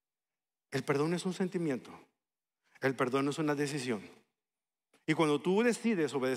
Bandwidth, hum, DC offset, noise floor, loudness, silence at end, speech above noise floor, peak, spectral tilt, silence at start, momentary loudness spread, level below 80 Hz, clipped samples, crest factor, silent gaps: 15 kHz; none; under 0.1%; under -90 dBFS; -33 LUFS; 0 s; over 58 dB; -16 dBFS; -5.5 dB/octave; 0.7 s; 9 LU; -84 dBFS; under 0.1%; 18 dB; none